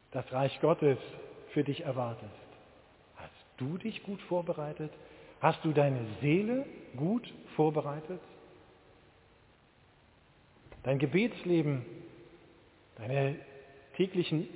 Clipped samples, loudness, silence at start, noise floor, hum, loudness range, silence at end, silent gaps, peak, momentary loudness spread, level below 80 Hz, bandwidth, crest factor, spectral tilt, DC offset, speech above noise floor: under 0.1%; -33 LUFS; 0.1 s; -64 dBFS; none; 7 LU; 0 s; none; -10 dBFS; 21 LU; -68 dBFS; 4 kHz; 24 dB; -6.5 dB/octave; under 0.1%; 32 dB